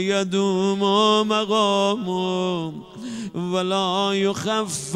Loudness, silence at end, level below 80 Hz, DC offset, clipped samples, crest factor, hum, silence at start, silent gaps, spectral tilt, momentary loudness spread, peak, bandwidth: -21 LUFS; 0 s; -64 dBFS; under 0.1%; under 0.1%; 14 dB; none; 0 s; none; -4.5 dB/octave; 12 LU; -8 dBFS; 13 kHz